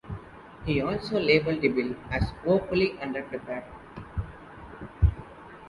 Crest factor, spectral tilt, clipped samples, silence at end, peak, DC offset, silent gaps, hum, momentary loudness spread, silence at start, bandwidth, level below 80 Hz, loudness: 20 dB; -8 dB/octave; under 0.1%; 0 s; -8 dBFS; under 0.1%; none; none; 21 LU; 0.05 s; 11.5 kHz; -38 dBFS; -28 LUFS